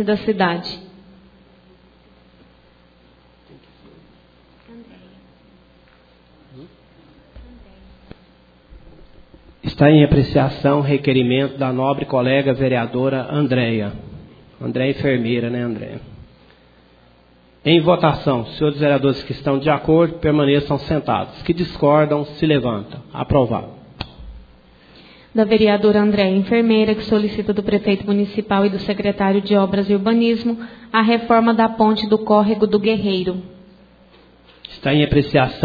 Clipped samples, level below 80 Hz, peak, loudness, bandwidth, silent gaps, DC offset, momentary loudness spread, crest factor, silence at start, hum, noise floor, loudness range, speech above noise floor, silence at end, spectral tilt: under 0.1%; -42 dBFS; 0 dBFS; -17 LUFS; 5 kHz; none; under 0.1%; 12 LU; 18 dB; 0 s; none; -51 dBFS; 6 LU; 35 dB; 0 s; -9 dB/octave